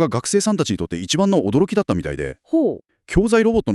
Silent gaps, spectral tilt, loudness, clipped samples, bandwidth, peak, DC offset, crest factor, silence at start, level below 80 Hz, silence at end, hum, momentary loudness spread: none; -5.5 dB/octave; -19 LUFS; under 0.1%; 12.5 kHz; -4 dBFS; under 0.1%; 16 dB; 0 s; -38 dBFS; 0 s; none; 8 LU